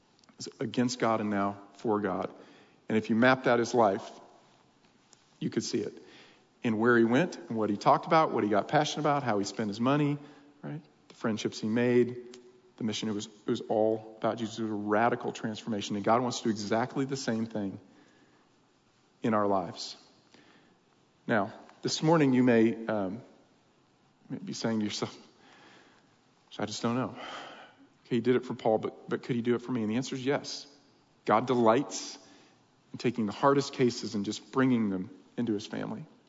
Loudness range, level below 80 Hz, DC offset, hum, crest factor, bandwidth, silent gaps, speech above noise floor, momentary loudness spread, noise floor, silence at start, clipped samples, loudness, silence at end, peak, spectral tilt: 8 LU; -78 dBFS; under 0.1%; none; 20 dB; 7.8 kHz; none; 37 dB; 15 LU; -66 dBFS; 0.4 s; under 0.1%; -30 LUFS; 0.25 s; -10 dBFS; -5.5 dB/octave